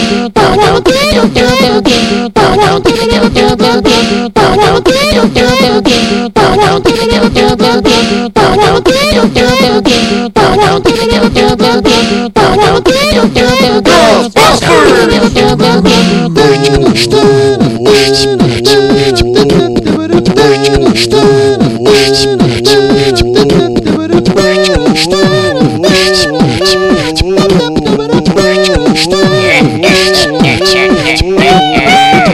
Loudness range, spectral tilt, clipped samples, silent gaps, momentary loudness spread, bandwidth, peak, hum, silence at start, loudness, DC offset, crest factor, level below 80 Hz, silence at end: 2 LU; -4.5 dB/octave; 3%; none; 3 LU; 15.5 kHz; 0 dBFS; none; 0 s; -7 LUFS; under 0.1%; 6 dB; -24 dBFS; 0 s